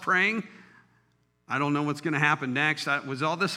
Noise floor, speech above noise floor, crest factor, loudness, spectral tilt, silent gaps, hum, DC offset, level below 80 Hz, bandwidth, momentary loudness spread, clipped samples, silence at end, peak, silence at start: -69 dBFS; 42 dB; 22 dB; -26 LUFS; -5 dB/octave; none; none; under 0.1%; -78 dBFS; 14.5 kHz; 8 LU; under 0.1%; 0 s; -8 dBFS; 0 s